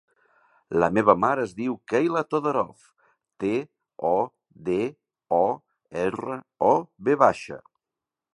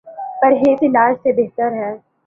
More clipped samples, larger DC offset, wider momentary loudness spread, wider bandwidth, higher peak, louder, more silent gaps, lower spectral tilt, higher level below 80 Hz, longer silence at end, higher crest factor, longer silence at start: neither; neither; first, 15 LU vs 12 LU; first, 11 kHz vs 6.6 kHz; about the same, -2 dBFS vs -2 dBFS; second, -25 LUFS vs -15 LUFS; neither; second, -7 dB/octave vs -8.5 dB/octave; about the same, -62 dBFS vs -60 dBFS; first, 0.75 s vs 0.3 s; first, 24 dB vs 14 dB; first, 0.7 s vs 0.05 s